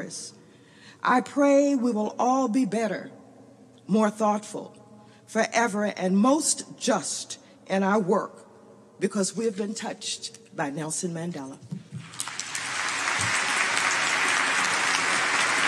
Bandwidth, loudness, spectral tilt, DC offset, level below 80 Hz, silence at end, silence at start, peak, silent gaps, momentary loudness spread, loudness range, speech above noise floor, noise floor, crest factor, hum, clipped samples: 13.5 kHz; -25 LUFS; -3 dB/octave; under 0.1%; -78 dBFS; 0 s; 0 s; -10 dBFS; none; 16 LU; 7 LU; 26 dB; -52 dBFS; 18 dB; none; under 0.1%